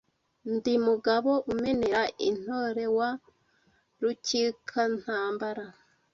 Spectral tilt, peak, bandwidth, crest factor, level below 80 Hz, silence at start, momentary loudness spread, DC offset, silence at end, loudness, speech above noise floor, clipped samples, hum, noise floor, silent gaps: -4 dB/octave; -12 dBFS; 7.6 kHz; 18 dB; -64 dBFS; 0.45 s; 9 LU; under 0.1%; 0.45 s; -29 LUFS; 40 dB; under 0.1%; none; -68 dBFS; none